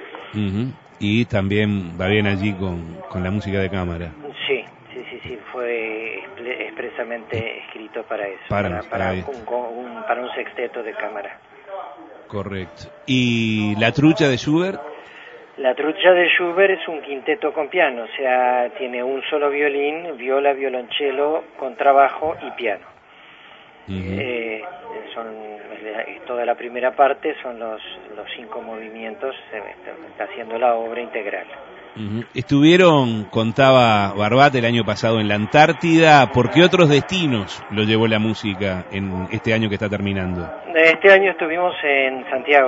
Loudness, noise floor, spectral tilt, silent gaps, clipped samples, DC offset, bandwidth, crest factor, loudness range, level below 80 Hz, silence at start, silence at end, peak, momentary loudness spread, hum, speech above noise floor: -19 LUFS; -46 dBFS; -6 dB/octave; none; under 0.1%; under 0.1%; 8 kHz; 20 dB; 12 LU; -52 dBFS; 0 s; 0 s; 0 dBFS; 19 LU; none; 27 dB